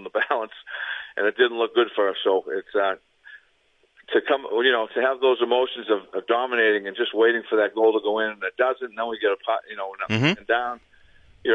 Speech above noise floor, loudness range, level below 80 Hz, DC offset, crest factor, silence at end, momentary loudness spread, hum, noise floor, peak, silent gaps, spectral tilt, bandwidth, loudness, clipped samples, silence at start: 41 dB; 3 LU; -66 dBFS; under 0.1%; 18 dB; 0 s; 9 LU; none; -64 dBFS; -6 dBFS; none; -6 dB/octave; 7.2 kHz; -23 LUFS; under 0.1%; 0 s